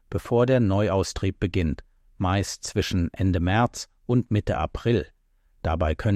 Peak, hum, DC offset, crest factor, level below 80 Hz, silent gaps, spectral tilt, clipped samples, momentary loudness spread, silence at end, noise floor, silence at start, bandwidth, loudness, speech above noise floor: -10 dBFS; none; under 0.1%; 14 dB; -38 dBFS; none; -6.5 dB/octave; under 0.1%; 8 LU; 0 s; -62 dBFS; 0.1 s; 14 kHz; -25 LUFS; 38 dB